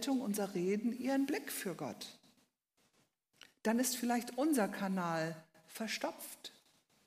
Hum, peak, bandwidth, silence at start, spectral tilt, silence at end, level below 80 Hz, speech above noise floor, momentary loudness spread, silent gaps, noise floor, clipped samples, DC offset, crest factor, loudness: none; -20 dBFS; 15.5 kHz; 0 s; -4.5 dB/octave; 0.55 s; -88 dBFS; 41 dB; 15 LU; none; -78 dBFS; under 0.1%; under 0.1%; 18 dB; -37 LUFS